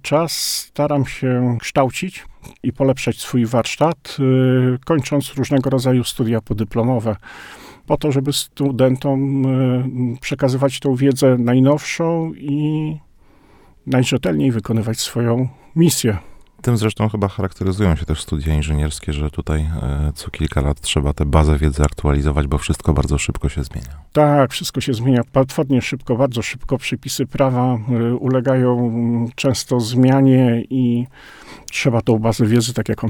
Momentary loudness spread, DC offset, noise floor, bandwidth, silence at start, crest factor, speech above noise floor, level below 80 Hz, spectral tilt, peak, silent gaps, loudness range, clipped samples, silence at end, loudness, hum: 8 LU; under 0.1%; -48 dBFS; 18.5 kHz; 0.05 s; 16 dB; 31 dB; -30 dBFS; -6 dB/octave; 0 dBFS; none; 4 LU; under 0.1%; 0 s; -18 LUFS; none